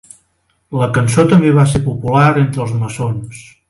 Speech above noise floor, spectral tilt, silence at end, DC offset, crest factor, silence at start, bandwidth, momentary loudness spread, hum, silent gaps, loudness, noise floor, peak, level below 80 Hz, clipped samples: 49 dB; -7 dB/octave; 0.3 s; under 0.1%; 14 dB; 0.7 s; 11.5 kHz; 12 LU; none; none; -13 LUFS; -62 dBFS; 0 dBFS; -40 dBFS; under 0.1%